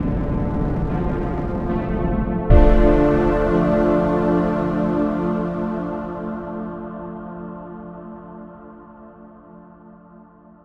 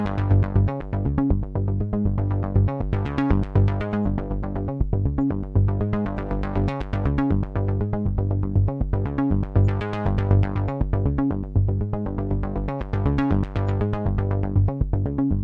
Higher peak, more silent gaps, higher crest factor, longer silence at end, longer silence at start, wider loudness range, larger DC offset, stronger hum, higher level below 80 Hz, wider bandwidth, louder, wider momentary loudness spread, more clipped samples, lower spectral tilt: first, 0 dBFS vs -4 dBFS; neither; about the same, 20 dB vs 16 dB; first, 0.75 s vs 0 s; about the same, 0 s vs 0 s; first, 18 LU vs 1 LU; neither; neither; about the same, -26 dBFS vs -30 dBFS; first, 5.8 kHz vs 4.6 kHz; first, -20 LUFS vs -24 LUFS; first, 20 LU vs 5 LU; neither; about the same, -10 dB/octave vs -10.5 dB/octave